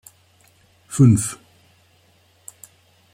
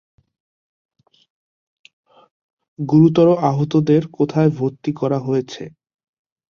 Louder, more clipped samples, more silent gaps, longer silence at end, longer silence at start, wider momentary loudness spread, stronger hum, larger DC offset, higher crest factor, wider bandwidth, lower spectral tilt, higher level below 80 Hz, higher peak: about the same, -18 LUFS vs -17 LUFS; neither; neither; first, 1.8 s vs 0.8 s; second, 0.9 s vs 2.8 s; first, 28 LU vs 16 LU; neither; neither; about the same, 20 dB vs 18 dB; first, 15.5 kHz vs 7 kHz; second, -7 dB/octave vs -9 dB/octave; first, -54 dBFS vs -60 dBFS; about the same, -2 dBFS vs -2 dBFS